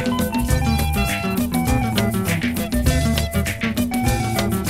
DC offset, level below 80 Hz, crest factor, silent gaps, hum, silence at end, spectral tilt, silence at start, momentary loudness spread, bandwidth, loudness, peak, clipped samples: under 0.1%; -28 dBFS; 16 dB; none; none; 0 s; -5 dB/octave; 0 s; 3 LU; 16.5 kHz; -20 LUFS; -2 dBFS; under 0.1%